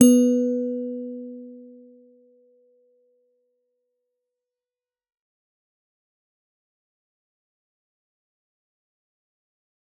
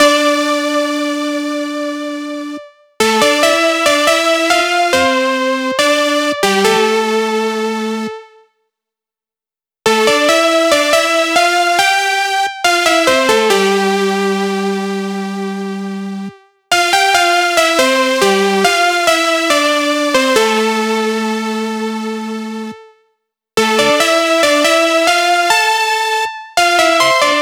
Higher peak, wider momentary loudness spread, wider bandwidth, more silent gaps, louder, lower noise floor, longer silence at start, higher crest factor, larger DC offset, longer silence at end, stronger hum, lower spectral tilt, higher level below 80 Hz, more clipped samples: about the same, -2 dBFS vs 0 dBFS; first, 25 LU vs 11 LU; second, 11.5 kHz vs over 20 kHz; neither; second, -22 LUFS vs -13 LUFS; about the same, under -90 dBFS vs under -90 dBFS; about the same, 0 s vs 0 s; first, 26 dB vs 14 dB; neither; first, 8.35 s vs 0 s; neither; first, -5 dB/octave vs -2.5 dB/octave; second, -82 dBFS vs -56 dBFS; neither